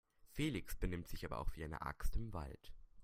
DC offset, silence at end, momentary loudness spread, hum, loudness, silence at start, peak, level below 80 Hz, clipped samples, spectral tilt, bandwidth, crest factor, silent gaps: under 0.1%; 0 s; 12 LU; none; -46 LUFS; 0.25 s; -24 dBFS; -48 dBFS; under 0.1%; -5.5 dB/octave; 16 kHz; 18 dB; none